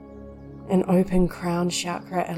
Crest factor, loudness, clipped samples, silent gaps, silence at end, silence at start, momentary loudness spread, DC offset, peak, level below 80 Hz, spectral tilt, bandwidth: 14 dB; -24 LUFS; under 0.1%; none; 0 s; 0 s; 21 LU; under 0.1%; -10 dBFS; -40 dBFS; -6 dB/octave; 14.5 kHz